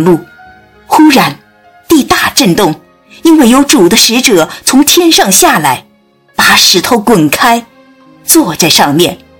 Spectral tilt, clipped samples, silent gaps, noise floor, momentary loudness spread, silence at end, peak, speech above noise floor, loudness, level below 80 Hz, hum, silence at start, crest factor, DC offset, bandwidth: -3 dB/octave; 7%; none; -47 dBFS; 9 LU; 0.25 s; 0 dBFS; 41 dB; -6 LUFS; -40 dBFS; none; 0 s; 8 dB; under 0.1%; over 20 kHz